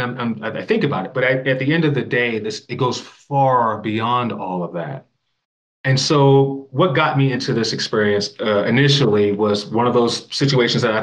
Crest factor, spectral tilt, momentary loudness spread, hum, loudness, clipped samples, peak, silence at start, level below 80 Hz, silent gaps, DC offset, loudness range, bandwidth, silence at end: 16 dB; -5.5 dB/octave; 11 LU; none; -18 LUFS; under 0.1%; -2 dBFS; 0 s; -64 dBFS; 5.45-5.84 s; under 0.1%; 4 LU; 9.4 kHz; 0 s